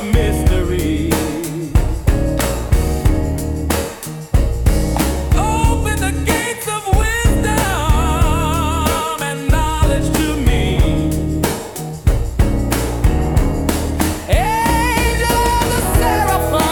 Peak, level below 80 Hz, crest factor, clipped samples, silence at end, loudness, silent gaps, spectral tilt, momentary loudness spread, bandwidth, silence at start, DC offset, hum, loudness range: 0 dBFS; -20 dBFS; 14 dB; under 0.1%; 0 s; -17 LUFS; none; -5 dB/octave; 5 LU; 19 kHz; 0 s; under 0.1%; none; 2 LU